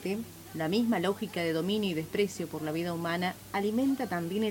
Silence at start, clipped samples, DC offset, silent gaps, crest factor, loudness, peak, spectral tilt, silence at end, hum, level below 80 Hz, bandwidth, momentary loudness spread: 0 s; under 0.1%; under 0.1%; none; 14 dB; -31 LUFS; -16 dBFS; -5.5 dB/octave; 0 s; none; -64 dBFS; 17 kHz; 7 LU